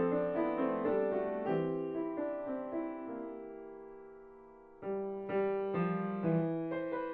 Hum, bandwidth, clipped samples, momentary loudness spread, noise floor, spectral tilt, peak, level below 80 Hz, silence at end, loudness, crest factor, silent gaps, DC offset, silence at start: none; 4.5 kHz; under 0.1%; 17 LU; -56 dBFS; -8 dB/octave; -22 dBFS; -68 dBFS; 0 s; -36 LUFS; 14 dB; none; under 0.1%; 0 s